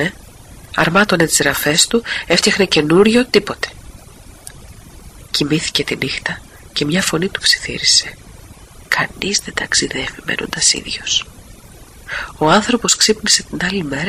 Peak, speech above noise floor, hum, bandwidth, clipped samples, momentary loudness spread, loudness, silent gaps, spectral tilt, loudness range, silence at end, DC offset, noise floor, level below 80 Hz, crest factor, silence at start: 0 dBFS; 23 dB; none; 15.5 kHz; under 0.1%; 13 LU; -15 LUFS; none; -2.5 dB/octave; 6 LU; 0 s; under 0.1%; -39 dBFS; -42 dBFS; 18 dB; 0 s